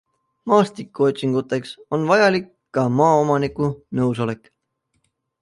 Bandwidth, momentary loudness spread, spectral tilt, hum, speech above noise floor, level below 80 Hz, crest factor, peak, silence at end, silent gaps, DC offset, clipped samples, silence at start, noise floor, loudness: 11.5 kHz; 11 LU; -6.5 dB/octave; none; 52 dB; -58 dBFS; 18 dB; -4 dBFS; 1.05 s; none; under 0.1%; under 0.1%; 0.45 s; -71 dBFS; -20 LUFS